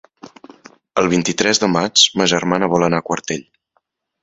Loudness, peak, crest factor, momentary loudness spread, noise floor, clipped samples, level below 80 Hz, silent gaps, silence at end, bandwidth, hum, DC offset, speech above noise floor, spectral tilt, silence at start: -16 LUFS; 0 dBFS; 18 dB; 11 LU; -67 dBFS; under 0.1%; -54 dBFS; none; 0.8 s; 8.2 kHz; none; under 0.1%; 50 dB; -3 dB/octave; 0.25 s